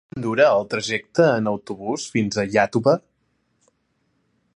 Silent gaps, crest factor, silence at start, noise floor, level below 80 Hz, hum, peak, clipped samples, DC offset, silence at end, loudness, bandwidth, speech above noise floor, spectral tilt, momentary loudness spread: none; 18 dB; 0.15 s; -69 dBFS; -60 dBFS; none; -4 dBFS; under 0.1%; under 0.1%; 1.55 s; -21 LUFS; 10.5 kHz; 49 dB; -5 dB/octave; 9 LU